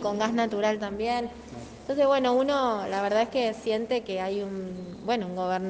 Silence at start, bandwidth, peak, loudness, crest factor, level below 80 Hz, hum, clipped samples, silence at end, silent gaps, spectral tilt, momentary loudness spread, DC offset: 0 s; 9.2 kHz; -12 dBFS; -27 LUFS; 16 dB; -58 dBFS; none; under 0.1%; 0 s; none; -5 dB/octave; 12 LU; under 0.1%